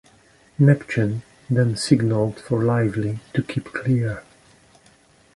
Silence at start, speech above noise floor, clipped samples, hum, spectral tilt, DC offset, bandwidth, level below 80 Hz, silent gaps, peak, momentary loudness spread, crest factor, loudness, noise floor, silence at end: 0.6 s; 35 dB; under 0.1%; none; -7 dB/octave; under 0.1%; 11.5 kHz; -52 dBFS; none; -2 dBFS; 11 LU; 20 dB; -22 LUFS; -55 dBFS; 1.15 s